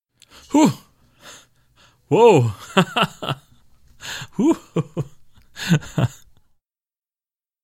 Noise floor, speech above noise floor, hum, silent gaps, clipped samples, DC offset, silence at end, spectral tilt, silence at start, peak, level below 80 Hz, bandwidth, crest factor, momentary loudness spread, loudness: under -90 dBFS; over 73 dB; none; none; under 0.1%; under 0.1%; 1.55 s; -6 dB/octave; 0.5 s; 0 dBFS; -54 dBFS; 16 kHz; 22 dB; 18 LU; -19 LUFS